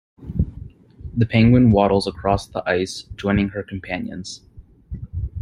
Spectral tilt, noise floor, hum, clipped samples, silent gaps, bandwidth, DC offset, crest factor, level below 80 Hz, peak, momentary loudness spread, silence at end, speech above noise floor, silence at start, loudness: -7 dB/octave; -39 dBFS; none; under 0.1%; none; 11.5 kHz; under 0.1%; 18 dB; -36 dBFS; -2 dBFS; 21 LU; 0 s; 21 dB; 0.2 s; -20 LUFS